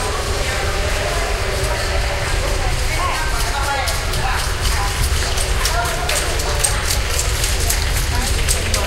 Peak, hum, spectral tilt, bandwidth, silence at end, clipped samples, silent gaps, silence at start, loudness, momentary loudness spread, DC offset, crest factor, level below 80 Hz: -2 dBFS; none; -2.5 dB/octave; 16.5 kHz; 0 s; under 0.1%; none; 0 s; -19 LUFS; 3 LU; under 0.1%; 16 dB; -22 dBFS